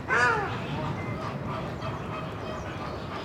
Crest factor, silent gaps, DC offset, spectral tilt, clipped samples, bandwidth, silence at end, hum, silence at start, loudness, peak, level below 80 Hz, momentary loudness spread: 20 dB; none; under 0.1%; -5.5 dB/octave; under 0.1%; 16 kHz; 0 s; none; 0 s; -31 LUFS; -10 dBFS; -48 dBFS; 11 LU